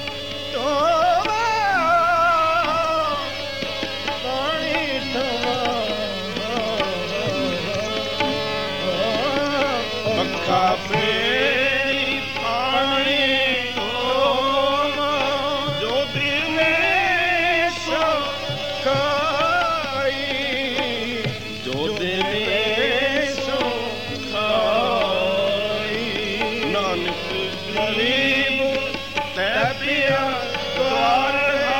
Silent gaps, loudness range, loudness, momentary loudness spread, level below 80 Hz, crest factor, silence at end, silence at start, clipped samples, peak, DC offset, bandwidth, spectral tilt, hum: none; 4 LU; -20 LUFS; 7 LU; -50 dBFS; 14 dB; 0 s; 0 s; under 0.1%; -6 dBFS; 0.8%; 16 kHz; -4 dB/octave; none